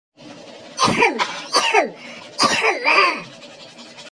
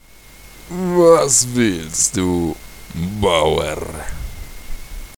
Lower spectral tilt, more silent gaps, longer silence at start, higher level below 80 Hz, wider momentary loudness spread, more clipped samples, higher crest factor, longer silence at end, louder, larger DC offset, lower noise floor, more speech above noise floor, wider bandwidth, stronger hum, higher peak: second, -2 dB/octave vs -4 dB/octave; neither; second, 0.2 s vs 0.4 s; second, -62 dBFS vs -34 dBFS; about the same, 24 LU vs 23 LU; neither; about the same, 20 dB vs 18 dB; about the same, 0.05 s vs 0 s; about the same, -17 LUFS vs -16 LUFS; neither; about the same, -41 dBFS vs -42 dBFS; second, 22 dB vs 26 dB; second, 10.5 kHz vs 20 kHz; neither; about the same, 0 dBFS vs 0 dBFS